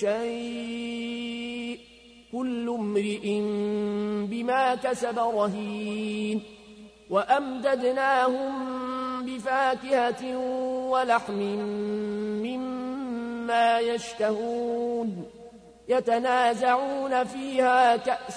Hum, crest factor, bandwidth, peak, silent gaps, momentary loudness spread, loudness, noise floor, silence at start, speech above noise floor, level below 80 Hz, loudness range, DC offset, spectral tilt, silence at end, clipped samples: none; 18 dB; 11 kHz; -10 dBFS; none; 10 LU; -27 LUFS; -52 dBFS; 0 s; 26 dB; -64 dBFS; 4 LU; under 0.1%; -5 dB/octave; 0 s; under 0.1%